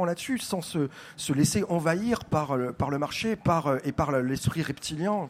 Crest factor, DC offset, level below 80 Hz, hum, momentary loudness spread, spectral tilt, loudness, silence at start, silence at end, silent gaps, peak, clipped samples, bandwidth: 16 dB; under 0.1%; -52 dBFS; none; 6 LU; -5.5 dB/octave; -28 LUFS; 0 s; 0 s; none; -10 dBFS; under 0.1%; 16 kHz